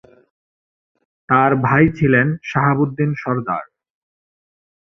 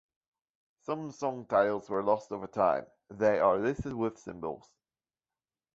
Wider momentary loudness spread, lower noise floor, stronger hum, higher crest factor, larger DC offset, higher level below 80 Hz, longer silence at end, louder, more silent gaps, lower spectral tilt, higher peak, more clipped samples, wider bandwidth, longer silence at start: second, 8 LU vs 14 LU; about the same, under -90 dBFS vs under -90 dBFS; neither; about the same, 18 dB vs 20 dB; neither; first, -48 dBFS vs -60 dBFS; about the same, 1.2 s vs 1.15 s; first, -17 LUFS vs -31 LUFS; neither; first, -9 dB/octave vs -7 dB/octave; first, -2 dBFS vs -12 dBFS; neither; second, 6.2 kHz vs 7.8 kHz; first, 1.3 s vs 0.9 s